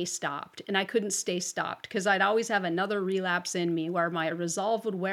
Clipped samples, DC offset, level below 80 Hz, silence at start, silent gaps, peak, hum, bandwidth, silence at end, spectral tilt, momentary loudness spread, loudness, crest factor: under 0.1%; under 0.1%; -86 dBFS; 0 s; none; -10 dBFS; none; 16 kHz; 0 s; -3.5 dB/octave; 7 LU; -29 LUFS; 18 dB